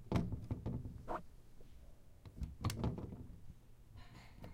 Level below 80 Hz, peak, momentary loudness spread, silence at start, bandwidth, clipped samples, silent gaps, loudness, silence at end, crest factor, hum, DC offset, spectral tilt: -54 dBFS; -24 dBFS; 22 LU; 0 s; 16 kHz; under 0.1%; none; -45 LUFS; 0 s; 22 dB; none; under 0.1%; -7 dB/octave